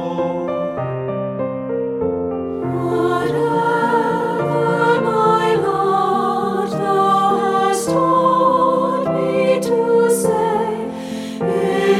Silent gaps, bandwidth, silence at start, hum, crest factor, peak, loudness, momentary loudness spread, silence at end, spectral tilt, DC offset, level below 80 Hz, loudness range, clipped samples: none; 15 kHz; 0 s; none; 14 dB; -4 dBFS; -17 LUFS; 8 LU; 0 s; -6 dB/octave; under 0.1%; -54 dBFS; 4 LU; under 0.1%